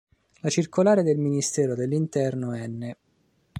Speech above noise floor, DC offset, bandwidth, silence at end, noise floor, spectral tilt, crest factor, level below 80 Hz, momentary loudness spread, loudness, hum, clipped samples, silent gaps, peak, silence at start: 43 dB; under 0.1%; 15 kHz; 0 s; -67 dBFS; -6 dB/octave; 18 dB; -66 dBFS; 13 LU; -24 LUFS; none; under 0.1%; none; -8 dBFS; 0.45 s